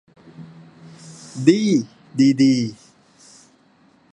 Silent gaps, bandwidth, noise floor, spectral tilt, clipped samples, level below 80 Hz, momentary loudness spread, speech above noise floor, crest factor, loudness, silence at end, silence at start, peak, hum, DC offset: none; 10 kHz; -56 dBFS; -6 dB/octave; under 0.1%; -68 dBFS; 22 LU; 39 dB; 20 dB; -18 LUFS; 1.4 s; 0.4 s; 0 dBFS; none; under 0.1%